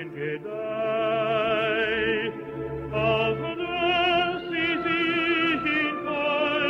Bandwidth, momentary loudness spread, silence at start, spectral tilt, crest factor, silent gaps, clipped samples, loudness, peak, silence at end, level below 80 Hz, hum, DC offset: 7.4 kHz; 9 LU; 0 s; -6.5 dB/octave; 14 dB; none; under 0.1%; -25 LUFS; -12 dBFS; 0 s; -52 dBFS; none; under 0.1%